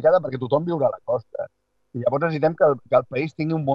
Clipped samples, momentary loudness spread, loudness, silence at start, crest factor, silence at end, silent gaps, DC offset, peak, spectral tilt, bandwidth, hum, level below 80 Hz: under 0.1%; 13 LU; -22 LUFS; 0 s; 18 dB; 0 s; none; under 0.1%; -4 dBFS; -9.5 dB/octave; 5.8 kHz; none; -64 dBFS